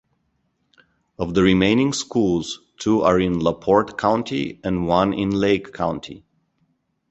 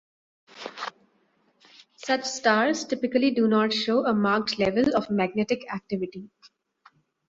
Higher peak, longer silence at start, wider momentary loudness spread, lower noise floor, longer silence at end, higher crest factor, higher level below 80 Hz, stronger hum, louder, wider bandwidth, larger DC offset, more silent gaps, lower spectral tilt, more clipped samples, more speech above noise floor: first, -2 dBFS vs -8 dBFS; first, 1.2 s vs 0.55 s; second, 9 LU vs 15 LU; about the same, -69 dBFS vs -67 dBFS; about the same, 0.95 s vs 1.05 s; about the same, 20 dB vs 20 dB; first, -46 dBFS vs -64 dBFS; neither; first, -20 LUFS vs -25 LUFS; about the same, 8.2 kHz vs 7.8 kHz; neither; neither; about the same, -5.5 dB/octave vs -4.5 dB/octave; neither; first, 50 dB vs 43 dB